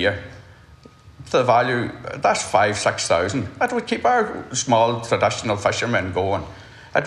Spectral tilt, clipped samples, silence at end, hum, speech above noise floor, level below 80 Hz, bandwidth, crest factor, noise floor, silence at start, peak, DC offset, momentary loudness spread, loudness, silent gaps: -4 dB/octave; under 0.1%; 0 s; none; 27 dB; -52 dBFS; 12 kHz; 18 dB; -47 dBFS; 0 s; -2 dBFS; under 0.1%; 7 LU; -20 LUFS; none